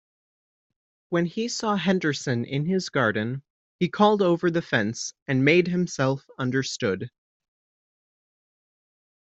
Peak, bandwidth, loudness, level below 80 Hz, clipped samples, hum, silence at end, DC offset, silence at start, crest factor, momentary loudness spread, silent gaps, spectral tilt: -4 dBFS; 8.2 kHz; -24 LUFS; -66 dBFS; under 0.1%; none; 2.3 s; under 0.1%; 1.1 s; 22 dB; 9 LU; 3.50-3.79 s, 5.22-5.26 s; -5.5 dB/octave